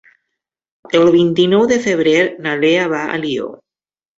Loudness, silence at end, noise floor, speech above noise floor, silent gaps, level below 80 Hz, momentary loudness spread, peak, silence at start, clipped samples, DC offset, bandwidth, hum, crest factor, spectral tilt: -14 LUFS; 0.6 s; under -90 dBFS; over 76 dB; none; -56 dBFS; 9 LU; -2 dBFS; 0.95 s; under 0.1%; under 0.1%; 7.8 kHz; none; 14 dB; -5.5 dB/octave